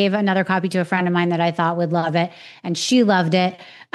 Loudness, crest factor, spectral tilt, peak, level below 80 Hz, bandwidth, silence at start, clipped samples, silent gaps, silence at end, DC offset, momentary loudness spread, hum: -19 LUFS; 16 dB; -5.5 dB/octave; -4 dBFS; -76 dBFS; 12 kHz; 0 s; under 0.1%; none; 0.1 s; under 0.1%; 7 LU; none